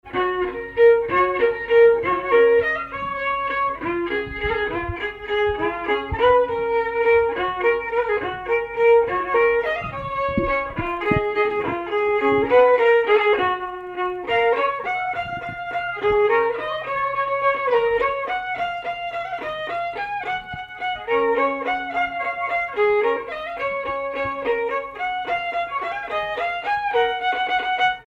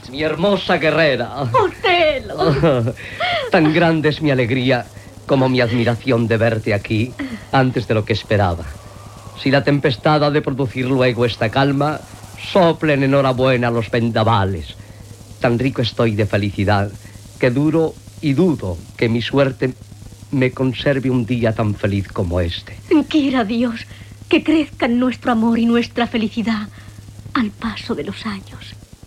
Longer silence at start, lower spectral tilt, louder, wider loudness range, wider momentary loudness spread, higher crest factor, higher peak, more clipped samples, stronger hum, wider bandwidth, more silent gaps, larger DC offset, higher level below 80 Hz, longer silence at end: about the same, 0.05 s vs 0 s; about the same, -6 dB/octave vs -7 dB/octave; second, -21 LUFS vs -17 LUFS; about the same, 5 LU vs 3 LU; second, 10 LU vs 13 LU; about the same, 16 dB vs 16 dB; second, -6 dBFS vs -2 dBFS; neither; neither; second, 6 kHz vs 14.5 kHz; neither; neither; about the same, -46 dBFS vs -44 dBFS; second, 0.05 s vs 0.25 s